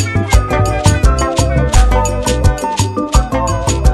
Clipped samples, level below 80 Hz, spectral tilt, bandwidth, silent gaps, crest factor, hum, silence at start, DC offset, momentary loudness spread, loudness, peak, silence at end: 0.5%; -14 dBFS; -5 dB/octave; 13.5 kHz; none; 12 dB; none; 0 s; under 0.1%; 4 LU; -14 LUFS; 0 dBFS; 0 s